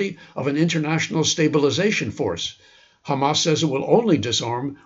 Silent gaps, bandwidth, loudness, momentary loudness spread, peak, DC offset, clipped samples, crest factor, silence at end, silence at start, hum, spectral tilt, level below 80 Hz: none; 8 kHz; -21 LUFS; 9 LU; -2 dBFS; under 0.1%; under 0.1%; 18 dB; 0.1 s; 0 s; none; -4.5 dB/octave; -60 dBFS